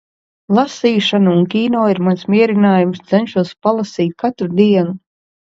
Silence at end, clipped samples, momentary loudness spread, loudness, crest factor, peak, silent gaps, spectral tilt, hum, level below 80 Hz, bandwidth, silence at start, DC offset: 0.45 s; under 0.1%; 6 LU; -15 LUFS; 14 dB; 0 dBFS; none; -7 dB/octave; none; -60 dBFS; 7.6 kHz; 0.5 s; under 0.1%